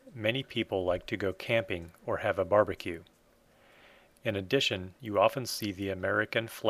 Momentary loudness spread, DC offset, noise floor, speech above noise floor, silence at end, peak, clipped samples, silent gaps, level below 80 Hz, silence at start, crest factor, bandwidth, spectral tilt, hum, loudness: 10 LU; under 0.1%; -64 dBFS; 33 dB; 0 s; -10 dBFS; under 0.1%; none; -62 dBFS; 0.05 s; 22 dB; 15.5 kHz; -4.5 dB/octave; none; -31 LUFS